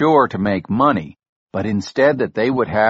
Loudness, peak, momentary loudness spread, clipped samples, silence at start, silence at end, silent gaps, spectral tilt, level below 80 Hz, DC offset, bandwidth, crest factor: -18 LUFS; -2 dBFS; 9 LU; under 0.1%; 0 s; 0 s; 1.29-1.46 s; -5.5 dB/octave; -50 dBFS; under 0.1%; 8 kHz; 16 dB